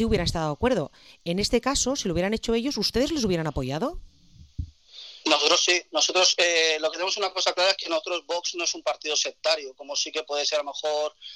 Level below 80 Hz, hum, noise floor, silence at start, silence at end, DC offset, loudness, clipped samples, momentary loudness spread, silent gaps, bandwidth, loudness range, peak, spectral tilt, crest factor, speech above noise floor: -44 dBFS; none; -46 dBFS; 0 s; 0 s; under 0.1%; -24 LUFS; under 0.1%; 12 LU; none; 14.5 kHz; 5 LU; -4 dBFS; -2.5 dB/octave; 22 dB; 21 dB